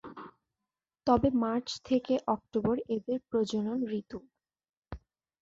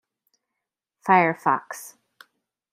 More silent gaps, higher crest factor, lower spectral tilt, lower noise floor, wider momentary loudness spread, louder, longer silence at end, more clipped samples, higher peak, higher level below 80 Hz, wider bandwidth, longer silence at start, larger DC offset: first, 4.69-4.82 s vs none; about the same, 22 dB vs 24 dB; about the same, -6.5 dB/octave vs -5.5 dB/octave; first, under -90 dBFS vs -85 dBFS; first, 22 LU vs 19 LU; second, -31 LUFS vs -21 LUFS; second, 0.45 s vs 0.85 s; neither; second, -12 dBFS vs -2 dBFS; first, -56 dBFS vs -78 dBFS; second, 7.8 kHz vs 16 kHz; second, 0.05 s vs 1.05 s; neither